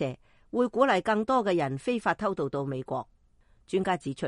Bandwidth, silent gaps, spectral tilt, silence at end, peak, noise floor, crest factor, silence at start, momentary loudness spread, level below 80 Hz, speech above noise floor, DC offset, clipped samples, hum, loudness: 11 kHz; none; -6.5 dB/octave; 0 s; -8 dBFS; -62 dBFS; 20 dB; 0 s; 11 LU; -62 dBFS; 35 dB; under 0.1%; under 0.1%; none; -28 LUFS